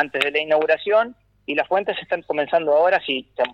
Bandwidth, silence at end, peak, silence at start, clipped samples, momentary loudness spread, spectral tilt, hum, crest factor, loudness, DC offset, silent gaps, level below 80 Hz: 10 kHz; 0 s; -2 dBFS; 0 s; under 0.1%; 8 LU; -4.5 dB/octave; none; 18 dB; -20 LUFS; under 0.1%; none; -64 dBFS